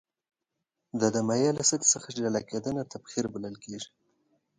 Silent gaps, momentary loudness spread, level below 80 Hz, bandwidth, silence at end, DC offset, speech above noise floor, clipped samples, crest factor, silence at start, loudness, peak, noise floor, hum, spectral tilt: none; 16 LU; -68 dBFS; 11 kHz; 0.75 s; under 0.1%; 56 dB; under 0.1%; 22 dB; 0.95 s; -28 LUFS; -8 dBFS; -85 dBFS; none; -3.5 dB/octave